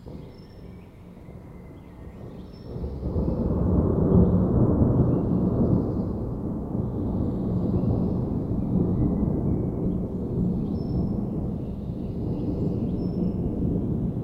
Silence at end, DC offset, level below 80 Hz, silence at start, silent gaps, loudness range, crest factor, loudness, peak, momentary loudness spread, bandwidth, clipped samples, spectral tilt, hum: 0 s; under 0.1%; -34 dBFS; 0 s; none; 6 LU; 18 dB; -26 LUFS; -8 dBFS; 22 LU; 5.6 kHz; under 0.1%; -12 dB/octave; none